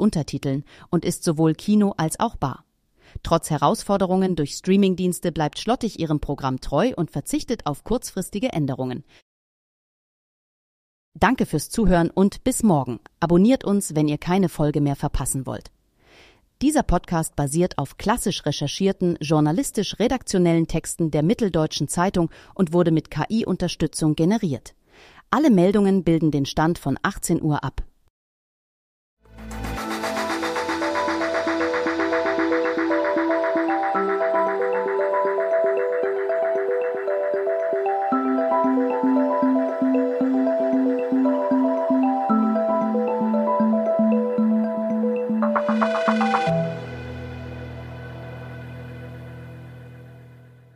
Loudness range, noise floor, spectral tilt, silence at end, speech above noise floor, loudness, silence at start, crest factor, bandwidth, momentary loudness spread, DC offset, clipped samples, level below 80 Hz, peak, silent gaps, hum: 7 LU; -54 dBFS; -6 dB/octave; 0.4 s; 33 dB; -22 LUFS; 0 s; 18 dB; 15.5 kHz; 10 LU; under 0.1%; under 0.1%; -42 dBFS; -4 dBFS; 9.22-11.12 s, 28.10-29.17 s; none